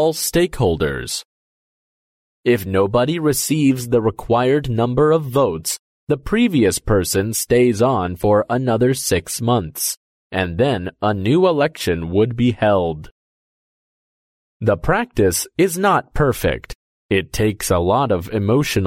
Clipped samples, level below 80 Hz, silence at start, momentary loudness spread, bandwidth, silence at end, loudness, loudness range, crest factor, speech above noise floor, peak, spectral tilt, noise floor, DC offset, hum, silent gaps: under 0.1%; -38 dBFS; 0 s; 7 LU; 16.5 kHz; 0 s; -18 LUFS; 3 LU; 14 dB; over 73 dB; -4 dBFS; -5 dB/octave; under -90 dBFS; under 0.1%; none; 1.25-2.44 s, 5.79-6.07 s, 9.97-10.30 s, 13.11-14.60 s, 16.75-17.09 s